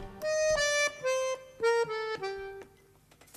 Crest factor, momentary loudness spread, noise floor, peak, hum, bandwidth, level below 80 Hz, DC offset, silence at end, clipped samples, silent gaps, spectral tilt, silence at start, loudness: 14 dB; 13 LU; -61 dBFS; -18 dBFS; none; 14 kHz; -56 dBFS; under 0.1%; 0.75 s; under 0.1%; none; -1 dB/octave; 0 s; -30 LUFS